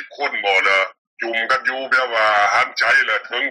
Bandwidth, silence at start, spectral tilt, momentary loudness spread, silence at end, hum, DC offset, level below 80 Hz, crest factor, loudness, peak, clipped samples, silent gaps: 11.5 kHz; 0 s; -1 dB/octave; 8 LU; 0 s; none; under 0.1%; -66 dBFS; 14 dB; -17 LUFS; -4 dBFS; under 0.1%; 0.98-1.17 s